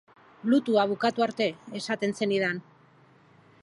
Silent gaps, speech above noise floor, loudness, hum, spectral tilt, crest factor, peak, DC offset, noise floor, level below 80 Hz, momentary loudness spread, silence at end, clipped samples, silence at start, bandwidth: none; 32 dB; -27 LUFS; none; -5 dB/octave; 18 dB; -10 dBFS; under 0.1%; -58 dBFS; -76 dBFS; 10 LU; 1 s; under 0.1%; 0.45 s; 11.5 kHz